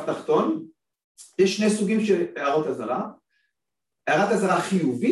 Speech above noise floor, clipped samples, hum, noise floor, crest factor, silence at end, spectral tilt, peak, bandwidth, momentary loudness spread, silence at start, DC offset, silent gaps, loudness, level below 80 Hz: 64 dB; under 0.1%; none; -86 dBFS; 14 dB; 0 s; -5.5 dB/octave; -10 dBFS; 12.5 kHz; 10 LU; 0 s; under 0.1%; 1.04-1.15 s; -23 LUFS; -68 dBFS